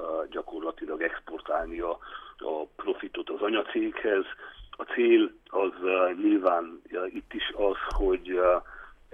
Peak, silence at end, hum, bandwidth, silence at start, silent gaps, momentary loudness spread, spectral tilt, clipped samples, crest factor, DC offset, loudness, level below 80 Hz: -10 dBFS; 0.25 s; none; 6 kHz; 0 s; none; 14 LU; -6.5 dB/octave; under 0.1%; 18 dB; under 0.1%; -29 LUFS; -46 dBFS